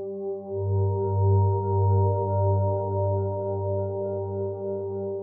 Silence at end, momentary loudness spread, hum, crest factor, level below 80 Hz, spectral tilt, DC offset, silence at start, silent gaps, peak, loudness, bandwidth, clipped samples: 0 s; 8 LU; 50 Hz at -25 dBFS; 12 dB; -60 dBFS; -16 dB/octave; under 0.1%; 0 s; none; -12 dBFS; -26 LUFS; 1.5 kHz; under 0.1%